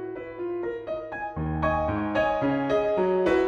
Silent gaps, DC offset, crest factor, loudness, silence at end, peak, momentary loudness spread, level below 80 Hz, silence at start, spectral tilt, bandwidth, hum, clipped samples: none; under 0.1%; 14 dB; -27 LUFS; 0 s; -12 dBFS; 10 LU; -44 dBFS; 0 s; -8 dB/octave; 8.4 kHz; none; under 0.1%